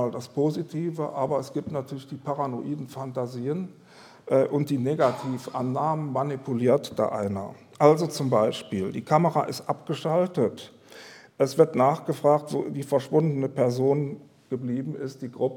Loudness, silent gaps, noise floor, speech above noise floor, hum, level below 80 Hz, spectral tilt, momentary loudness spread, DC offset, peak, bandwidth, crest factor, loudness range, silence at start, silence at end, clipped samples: -26 LUFS; none; -47 dBFS; 22 dB; none; -72 dBFS; -7 dB/octave; 13 LU; under 0.1%; -2 dBFS; 18 kHz; 22 dB; 6 LU; 0 s; 0 s; under 0.1%